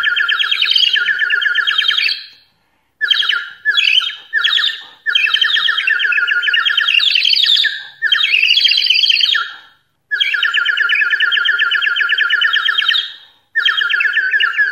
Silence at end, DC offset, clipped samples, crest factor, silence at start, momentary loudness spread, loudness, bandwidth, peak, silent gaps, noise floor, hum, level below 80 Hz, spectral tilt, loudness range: 0 s; under 0.1%; under 0.1%; 14 dB; 0 s; 7 LU; -12 LUFS; 16 kHz; 0 dBFS; none; -61 dBFS; none; -72 dBFS; 3.5 dB/octave; 3 LU